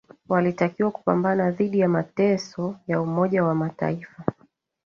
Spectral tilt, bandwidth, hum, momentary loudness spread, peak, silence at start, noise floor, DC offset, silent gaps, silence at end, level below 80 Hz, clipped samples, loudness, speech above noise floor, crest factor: -8 dB/octave; 7 kHz; none; 9 LU; -6 dBFS; 0.3 s; -62 dBFS; under 0.1%; none; 0.55 s; -62 dBFS; under 0.1%; -24 LUFS; 39 dB; 18 dB